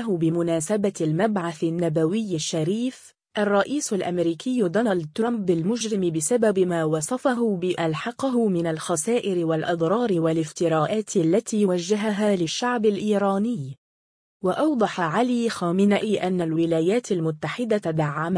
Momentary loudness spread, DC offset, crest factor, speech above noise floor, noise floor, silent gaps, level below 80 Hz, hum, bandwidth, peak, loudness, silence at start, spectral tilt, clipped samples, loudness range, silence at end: 4 LU; under 0.1%; 14 dB; over 67 dB; under -90 dBFS; 13.78-14.40 s; -66 dBFS; none; 10.5 kHz; -8 dBFS; -23 LUFS; 0 s; -5.5 dB/octave; under 0.1%; 2 LU; 0 s